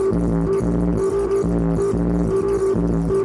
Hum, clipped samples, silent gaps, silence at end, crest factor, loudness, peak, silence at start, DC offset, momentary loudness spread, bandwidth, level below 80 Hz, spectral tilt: none; under 0.1%; none; 0 s; 10 dB; -20 LUFS; -8 dBFS; 0 s; under 0.1%; 1 LU; 11.5 kHz; -30 dBFS; -9 dB/octave